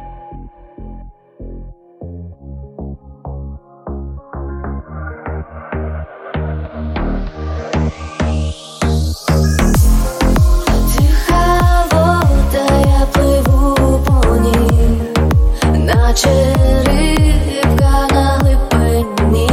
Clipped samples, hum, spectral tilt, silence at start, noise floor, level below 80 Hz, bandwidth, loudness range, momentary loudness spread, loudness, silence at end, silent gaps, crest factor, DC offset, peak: under 0.1%; none; -6 dB/octave; 0 s; -34 dBFS; -16 dBFS; 16.5 kHz; 17 LU; 20 LU; -14 LUFS; 0 s; none; 12 dB; under 0.1%; 0 dBFS